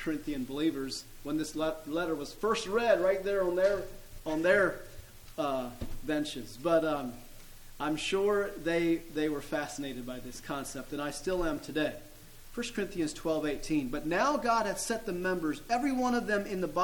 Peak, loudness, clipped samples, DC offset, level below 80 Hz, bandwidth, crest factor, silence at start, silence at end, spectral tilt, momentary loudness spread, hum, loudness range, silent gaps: -14 dBFS; -32 LUFS; under 0.1%; under 0.1%; -50 dBFS; 19 kHz; 18 dB; 0 s; 0 s; -4.5 dB/octave; 13 LU; none; 5 LU; none